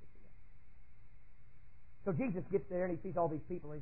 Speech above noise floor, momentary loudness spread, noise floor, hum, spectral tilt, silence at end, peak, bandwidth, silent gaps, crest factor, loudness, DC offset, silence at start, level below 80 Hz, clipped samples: 21 dB; 7 LU; -59 dBFS; none; -11 dB/octave; 0 s; -22 dBFS; 2.9 kHz; none; 18 dB; -39 LUFS; 0.5%; 0 s; -60 dBFS; under 0.1%